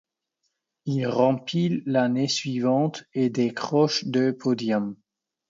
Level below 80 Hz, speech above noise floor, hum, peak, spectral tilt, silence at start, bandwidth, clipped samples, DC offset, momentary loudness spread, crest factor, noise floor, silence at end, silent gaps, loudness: -70 dBFS; 54 dB; none; -6 dBFS; -6 dB/octave; 0.85 s; 7.8 kHz; under 0.1%; under 0.1%; 6 LU; 18 dB; -78 dBFS; 0.55 s; none; -24 LUFS